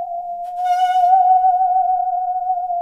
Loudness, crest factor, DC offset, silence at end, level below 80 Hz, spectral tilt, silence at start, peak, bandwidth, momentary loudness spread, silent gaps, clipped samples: -17 LUFS; 12 dB; 0.1%; 0 s; -58 dBFS; -1 dB/octave; 0 s; -4 dBFS; 7 kHz; 12 LU; none; under 0.1%